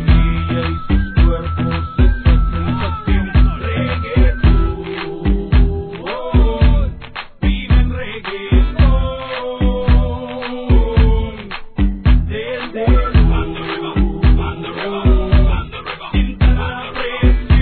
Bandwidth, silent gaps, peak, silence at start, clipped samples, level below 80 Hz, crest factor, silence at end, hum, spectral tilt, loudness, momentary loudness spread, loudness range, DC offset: 4.5 kHz; none; 0 dBFS; 0 s; under 0.1%; -16 dBFS; 14 dB; 0 s; none; -11 dB/octave; -17 LUFS; 10 LU; 1 LU; 0.3%